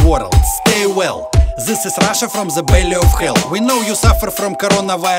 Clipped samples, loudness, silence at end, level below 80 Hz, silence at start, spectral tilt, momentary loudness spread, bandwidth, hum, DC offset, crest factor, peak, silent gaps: under 0.1%; -14 LUFS; 0 s; -18 dBFS; 0 s; -4.5 dB/octave; 5 LU; 16.5 kHz; none; under 0.1%; 12 dB; 0 dBFS; none